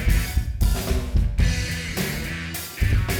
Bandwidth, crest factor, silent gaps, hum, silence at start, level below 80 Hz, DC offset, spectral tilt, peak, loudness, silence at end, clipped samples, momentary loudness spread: over 20 kHz; 14 dB; none; none; 0 s; -24 dBFS; under 0.1%; -4.5 dB/octave; -8 dBFS; -25 LUFS; 0 s; under 0.1%; 6 LU